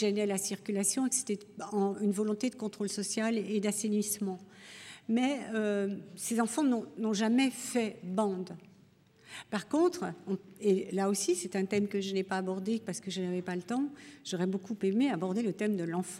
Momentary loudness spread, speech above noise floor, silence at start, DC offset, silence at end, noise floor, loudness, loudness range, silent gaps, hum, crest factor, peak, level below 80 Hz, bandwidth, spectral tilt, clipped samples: 9 LU; 30 dB; 0 s; under 0.1%; 0 s; -62 dBFS; -32 LUFS; 2 LU; none; none; 16 dB; -16 dBFS; -82 dBFS; 16 kHz; -4.5 dB/octave; under 0.1%